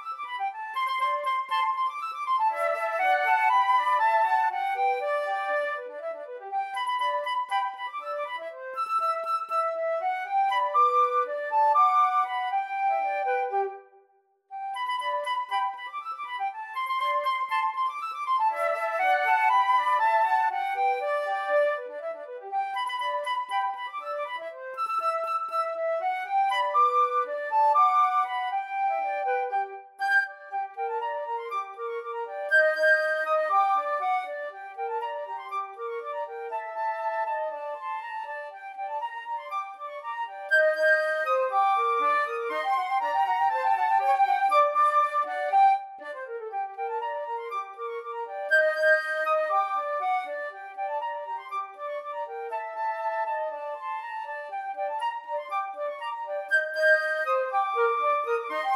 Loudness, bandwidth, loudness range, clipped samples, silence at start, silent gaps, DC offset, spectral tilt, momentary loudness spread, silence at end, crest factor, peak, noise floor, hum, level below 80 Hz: -27 LUFS; 14.5 kHz; 8 LU; under 0.1%; 0 s; none; under 0.1%; 1 dB/octave; 13 LU; 0 s; 16 dB; -10 dBFS; -65 dBFS; none; under -90 dBFS